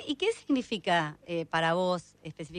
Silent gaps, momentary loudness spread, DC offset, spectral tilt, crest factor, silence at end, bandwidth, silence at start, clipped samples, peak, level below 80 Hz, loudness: none; 9 LU; under 0.1%; -5 dB/octave; 16 dB; 0 s; 10.5 kHz; 0 s; under 0.1%; -14 dBFS; -66 dBFS; -30 LUFS